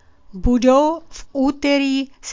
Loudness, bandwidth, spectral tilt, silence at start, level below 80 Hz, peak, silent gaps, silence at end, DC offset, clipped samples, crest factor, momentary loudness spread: -18 LUFS; 7.6 kHz; -5 dB/octave; 0.3 s; -34 dBFS; -2 dBFS; none; 0 s; under 0.1%; under 0.1%; 16 dB; 12 LU